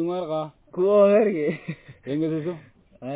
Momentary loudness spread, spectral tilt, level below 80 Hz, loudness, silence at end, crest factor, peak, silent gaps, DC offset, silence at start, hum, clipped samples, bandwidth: 21 LU; -11 dB/octave; -64 dBFS; -23 LUFS; 0 s; 16 dB; -8 dBFS; none; under 0.1%; 0 s; none; under 0.1%; 4 kHz